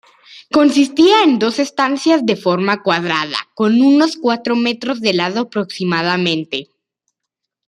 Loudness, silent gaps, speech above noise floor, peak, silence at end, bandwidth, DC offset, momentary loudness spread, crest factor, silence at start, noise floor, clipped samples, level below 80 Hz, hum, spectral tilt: -15 LUFS; none; 65 dB; 0 dBFS; 1.05 s; 11.5 kHz; under 0.1%; 9 LU; 14 dB; 0.3 s; -80 dBFS; under 0.1%; -62 dBFS; none; -5 dB/octave